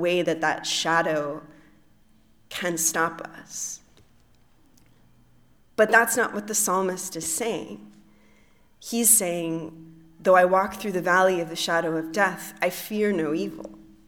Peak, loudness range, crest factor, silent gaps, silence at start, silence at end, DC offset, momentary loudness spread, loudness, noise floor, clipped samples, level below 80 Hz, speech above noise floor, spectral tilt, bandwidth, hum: -4 dBFS; 8 LU; 22 dB; none; 0 s; 0.25 s; under 0.1%; 18 LU; -23 LUFS; -57 dBFS; under 0.1%; -64 dBFS; 33 dB; -2.5 dB/octave; 19 kHz; none